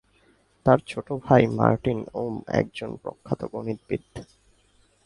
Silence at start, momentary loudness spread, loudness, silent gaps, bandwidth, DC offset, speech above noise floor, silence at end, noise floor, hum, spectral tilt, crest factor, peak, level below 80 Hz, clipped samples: 0.65 s; 15 LU; -25 LUFS; none; 11.5 kHz; under 0.1%; 38 dB; 0.8 s; -62 dBFS; none; -8 dB/octave; 24 dB; -2 dBFS; -52 dBFS; under 0.1%